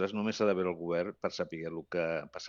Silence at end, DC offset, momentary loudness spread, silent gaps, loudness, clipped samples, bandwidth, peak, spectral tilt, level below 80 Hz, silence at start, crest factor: 0 s; under 0.1%; 8 LU; none; -34 LUFS; under 0.1%; 7.4 kHz; -16 dBFS; -4.5 dB/octave; -72 dBFS; 0 s; 18 dB